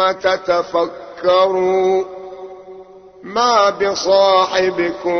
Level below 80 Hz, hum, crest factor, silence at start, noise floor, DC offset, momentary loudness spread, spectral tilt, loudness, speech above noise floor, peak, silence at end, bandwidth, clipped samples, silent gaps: -54 dBFS; none; 14 dB; 0 s; -39 dBFS; under 0.1%; 18 LU; -3.5 dB/octave; -15 LUFS; 24 dB; -2 dBFS; 0 s; 6.6 kHz; under 0.1%; none